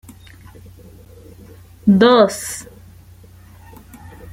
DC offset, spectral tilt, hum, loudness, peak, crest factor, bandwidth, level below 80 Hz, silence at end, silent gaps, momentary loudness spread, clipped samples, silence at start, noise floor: under 0.1%; -5.5 dB/octave; none; -14 LUFS; 0 dBFS; 20 dB; 16.5 kHz; -48 dBFS; 1.7 s; none; 20 LU; under 0.1%; 1.85 s; -43 dBFS